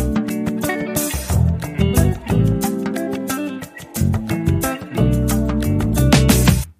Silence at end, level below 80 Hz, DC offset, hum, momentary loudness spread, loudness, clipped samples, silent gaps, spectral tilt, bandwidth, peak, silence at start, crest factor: 0.1 s; -26 dBFS; under 0.1%; none; 9 LU; -18 LUFS; under 0.1%; none; -5.5 dB/octave; 15.5 kHz; 0 dBFS; 0 s; 18 dB